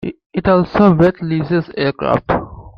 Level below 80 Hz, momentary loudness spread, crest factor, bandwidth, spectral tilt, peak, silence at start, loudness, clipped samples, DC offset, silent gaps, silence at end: -38 dBFS; 9 LU; 14 dB; 6 kHz; -9.5 dB/octave; 0 dBFS; 0 s; -15 LUFS; under 0.1%; under 0.1%; 0.26-0.30 s; 0.05 s